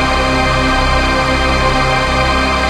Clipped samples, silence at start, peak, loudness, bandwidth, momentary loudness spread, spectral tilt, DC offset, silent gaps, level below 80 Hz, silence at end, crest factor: under 0.1%; 0 s; -2 dBFS; -13 LUFS; 13.5 kHz; 0 LU; -4.5 dB/octave; under 0.1%; none; -20 dBFS; 0 s; 12 dB